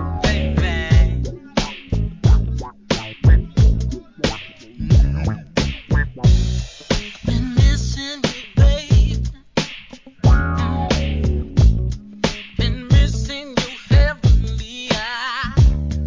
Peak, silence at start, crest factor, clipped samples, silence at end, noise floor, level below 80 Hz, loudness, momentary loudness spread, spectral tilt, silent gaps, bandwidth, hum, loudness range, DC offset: -2 dBFS; 0 s; 16 dB; under 0.1%; 0 s; -39 dBFS; -20 dBFS; -19 LUFS; 8 LU; -6 dB/octave; none; 7.6 kHz; none; 1 LU; 0.2%